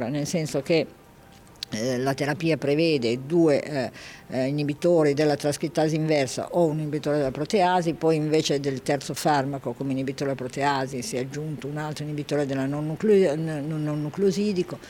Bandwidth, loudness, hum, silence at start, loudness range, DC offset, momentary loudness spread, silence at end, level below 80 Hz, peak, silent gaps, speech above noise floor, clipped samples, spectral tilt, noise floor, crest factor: 17 kHz; -25 LUFS; none; 0 s; 4 LU; under 0.1%; 10 LU; 0 s; -58 dBFS; -10 dBFS; none; 26 dB; under 0.1%; -5.5 dB/octave; -50 dBFS; 14 dB